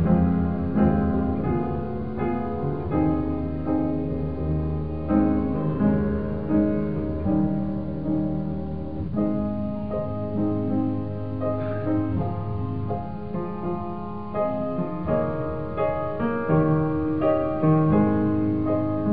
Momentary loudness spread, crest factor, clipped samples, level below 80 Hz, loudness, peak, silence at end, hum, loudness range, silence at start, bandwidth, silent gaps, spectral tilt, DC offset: 8 LU; 16 dB; under 0.1%; -38 dBFS; -25 LUFS; -8 dBFS; 0 s; none; 5 LU; 0 s; 4.8 kHz; none; -13.5 dB/octave; 1%